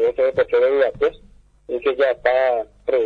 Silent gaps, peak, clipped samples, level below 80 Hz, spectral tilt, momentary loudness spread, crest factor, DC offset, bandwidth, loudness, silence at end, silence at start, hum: none; -2 dBFS; under 0.1%; -50 dBFS; -6 dB/octave; 6 LU; 18 dB; under 0.1%; 5 kHz; -19 LUFS; 0 s; 0 s; 50 Hz at -55 dBFS